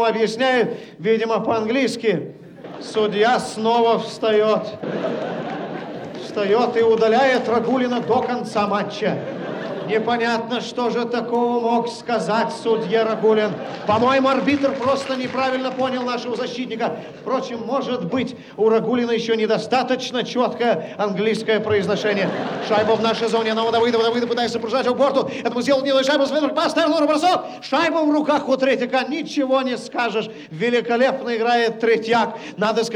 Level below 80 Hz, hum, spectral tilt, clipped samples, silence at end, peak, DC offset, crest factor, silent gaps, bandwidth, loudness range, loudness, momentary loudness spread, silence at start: -66 dBFS; none; -5 dB/octave; under 0.1%; 0 s; -6 dBFS; under 0.1%; 14 dB; none; 11 kHz; 3 LU; -20 LUFS; 8 LU; 0 s